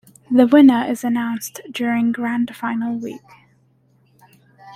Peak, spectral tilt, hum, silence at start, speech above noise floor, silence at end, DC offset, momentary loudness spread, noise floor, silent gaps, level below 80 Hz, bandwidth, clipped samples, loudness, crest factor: -2 dBFS; -5 dB/octave; none; 0.3 s; 41 dB; 0 s; under 0.1%; 17 LU; -58 dBFS; none; -62 dBFS; 15 kHz; under 0.1%; -18 LUFS; 16 dB